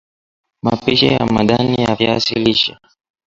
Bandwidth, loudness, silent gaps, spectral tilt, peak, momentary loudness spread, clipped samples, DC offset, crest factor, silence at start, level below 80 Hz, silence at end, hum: 7.8 kHz; -15 LUFS; none; -5.5 dB/octave; 0 dBFS; 6 LU; under 0.1%; under 0.1%; 16 dB; 0.65 s; -44 dBFS; 0.55 s; none